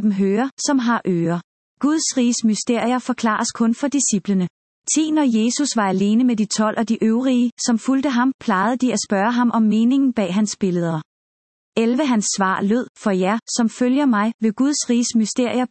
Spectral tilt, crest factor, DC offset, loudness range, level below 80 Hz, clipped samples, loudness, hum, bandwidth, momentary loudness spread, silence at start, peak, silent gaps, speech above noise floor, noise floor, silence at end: -4.5 dB/octave; 14 dB; under 0.1%; 2 LU; -66 dBFS; under 0.1%; -19 LUFS; none; 8.8 kHz; 4 LU; 0 s; -4 dBFS; 0.51-0.57 s, 1.44-1.77 s, 4.50-4.82 s, 7.52-7.57 s, 8.34-8.39 s, 11.05-11.72 s, 12.89-12.95 s, 14.34-14.39 s; over 72 dB; under -90 dBFS; 0.05 s